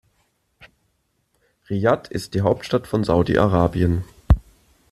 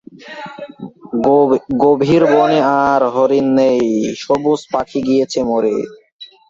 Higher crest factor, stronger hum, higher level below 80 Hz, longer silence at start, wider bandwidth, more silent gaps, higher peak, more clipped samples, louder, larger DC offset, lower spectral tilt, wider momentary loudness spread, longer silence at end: first, 20 dB vs 14 dB; neither; first, -32 dBFS vs -52 dBFS; first, 1.7 s vs 0.25 s; first, 13 kHz vs 7.8 kHz; second, none vs 6.12-6.19 s; about the same, -2 dBFS vs 0 dBFS; neither; second, -21 LUFS vs -14 LUFS; neither; about the same, -7.5 dB/octave vs -6.5 dB/octave; second, 6 LU vs 19 LU; first, 0.5 s vs 0.25 s